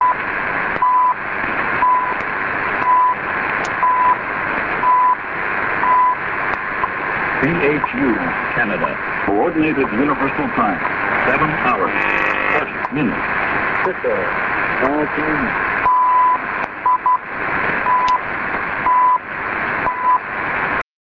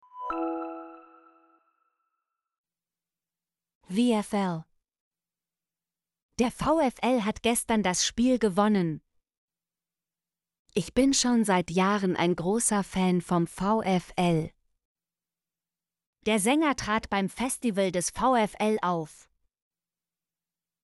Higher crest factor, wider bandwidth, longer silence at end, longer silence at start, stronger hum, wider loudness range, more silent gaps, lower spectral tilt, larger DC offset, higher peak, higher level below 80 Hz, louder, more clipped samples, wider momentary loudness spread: about the same, 16 dB vs 18 dB; second, 7.4 kHz vs 12 kHz; second, 0.3 s vs 1.75 s; second, 0 s vs 0.15 s; neither; second, 1 LU vs 7 LU; second, none vs 2.58-2.64 s, 3.75-3.81 s, 5.00-5.11 s, 6.22-6.29 s, 9.37-9.48 s, 10.59-10.65 s, 14.85-14.95 s, 16.07-16.13 s; first, -6.5 dB/octave vs -4.5 dB/octave; neither; first, -2 dBFS vs -10 dBFS; first, -44 dBFS vs -56 dBFS; first, -17 LUFS vs -26 LUFS; neither; second, 6 LU vs 9 LU